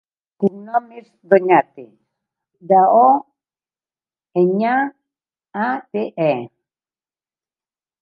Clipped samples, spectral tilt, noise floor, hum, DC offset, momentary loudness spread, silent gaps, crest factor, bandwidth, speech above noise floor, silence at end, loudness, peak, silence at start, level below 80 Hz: under 0.1%; -9.5 dB/octave; under -90 dBFS; none; under 0.1%; 13 LU; none; 18 dB; 5 kHz; over 74 dB; 1.55 s; -17 LUFS; 0 dBFS; 0.4 s; -76 dBFS